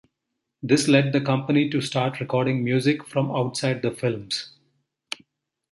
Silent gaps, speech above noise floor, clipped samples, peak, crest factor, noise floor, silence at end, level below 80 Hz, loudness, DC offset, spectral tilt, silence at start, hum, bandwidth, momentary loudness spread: none; 58 dB; under 0.1%; -4 dBFS; 20 dB; -81 dBFS; 1.25 s; -64 dBFS; -23 LUFS; under 0.1%; -5.5 dB/octave; 0.65 s; none; 11.5 kHz; 17 LU